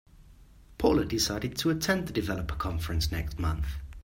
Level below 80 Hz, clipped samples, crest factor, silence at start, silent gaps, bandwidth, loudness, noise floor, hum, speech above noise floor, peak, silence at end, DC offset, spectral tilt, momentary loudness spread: -40 dBFS; under 0.1%; 20 dB; 0.2 s; none; 16 kHz; -30 LUFS; -54 dBFS; none; 25 dB; -10 dBFS; 0 s; under 0.1%; -5 dB/octave; 7 LU